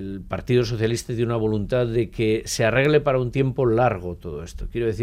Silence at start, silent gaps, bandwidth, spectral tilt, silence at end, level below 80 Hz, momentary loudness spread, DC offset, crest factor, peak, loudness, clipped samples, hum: 0 s; none; 15.5 kHz; -6 dB/octave; 0 s; -40 dBFS; 12 LU; under 0.1%; 16 dB; -6 dBFS; -22 LUFS; under 0.1%; none